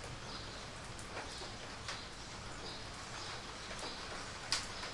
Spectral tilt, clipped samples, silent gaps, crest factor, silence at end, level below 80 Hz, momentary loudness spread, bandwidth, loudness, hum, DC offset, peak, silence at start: -2.5 dB/octave; under 0.1%; none; 30 dB; 0 s; -56 dBFS; 9 LU; 11.5 kHz; -44 LUFS; none; under 0.1%; -16 dBFS; 0 s